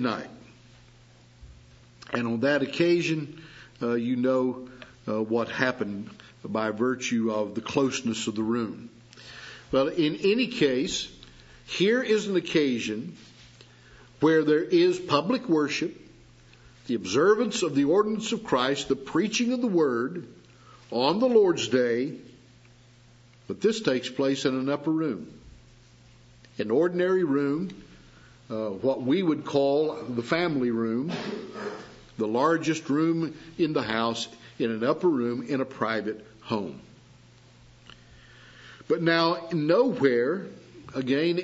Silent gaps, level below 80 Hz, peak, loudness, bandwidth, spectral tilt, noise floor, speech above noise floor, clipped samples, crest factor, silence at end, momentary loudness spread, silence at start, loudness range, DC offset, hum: none; -62 dBFS; -6 dBFS; -26 LUFS; 8 kHz; -5 dB/octave; -55 dBFS; 29 dB; under 0.1%; 22 dB; 0 s; 15 LU; 0 s; 4 LU; under 0.1%; none